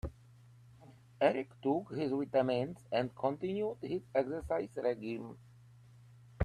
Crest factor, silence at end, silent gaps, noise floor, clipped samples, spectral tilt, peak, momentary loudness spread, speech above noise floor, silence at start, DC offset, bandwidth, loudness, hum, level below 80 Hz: 22 dB; 0 s; none; -60 dBFS; under 0.1%; -7.5 dB/octave; -14 dBFS; 9 LU; 25 dB; 0.05 s; under 0.1%; 12.5 kHz; -36 LUFS; none; -60 dBFS